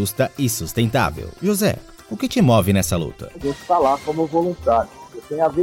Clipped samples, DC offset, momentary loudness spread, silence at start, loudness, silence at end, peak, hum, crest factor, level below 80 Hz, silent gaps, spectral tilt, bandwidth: under 0.1%; under 0.1%; 14 LU; 0 s; -20 LUFS; 0 s; -4 dBFS; none; 16 dB; -42 dBFS; none; -5.5 dB/octave; 17 kHz